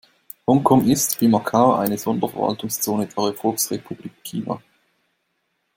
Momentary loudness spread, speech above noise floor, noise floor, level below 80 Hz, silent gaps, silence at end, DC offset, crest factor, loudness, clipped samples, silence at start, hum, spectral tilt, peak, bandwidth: 14 LU; 52 dB; -72 dBFS; -58 dBFS; none; 1.2 s; under 0.1%; 20 dB; -20 LUFS; under 0.1%; 0.5 s; none; -5 dB/octave; -2 dBFS; 17 kHz